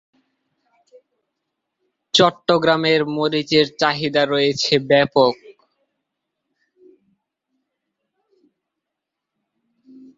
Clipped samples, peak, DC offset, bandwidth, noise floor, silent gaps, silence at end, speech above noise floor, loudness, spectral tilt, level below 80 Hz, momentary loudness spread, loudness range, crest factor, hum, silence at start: under 0.1%; 0 dBFS; under 0.1%; 7.8 kHz; -82 dBFS; none; 4.65 s; 65 dB; -17 LUFS; -4.5 dB/octave; -62 dBFS; 4 LU; 5 LU; 20 dB; none; 2.15 s